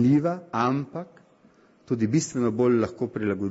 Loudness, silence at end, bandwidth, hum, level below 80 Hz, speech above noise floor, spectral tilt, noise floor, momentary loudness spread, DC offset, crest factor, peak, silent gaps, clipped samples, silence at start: -25 LUFS; 0 s; 8 kHz; none; -62 dBFS; 34 dB; -7 dB/octave; -58 dBFS; 11 LU; under 0.1%; 16 dB; -10 dBFS; none; under 0.1%; 0 s